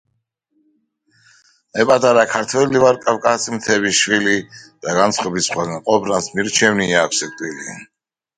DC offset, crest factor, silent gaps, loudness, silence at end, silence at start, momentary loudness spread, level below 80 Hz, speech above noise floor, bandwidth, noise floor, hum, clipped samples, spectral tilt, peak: under 0.1%; 18 dB; none; -16 LUFS; 0.55 s; 1.75 s; 13 LU; -56 dBFS; 53 dB; 11.5 kHz; -70 dBFS; none; under 0.1%; -3 dB/octave; 0 dBFS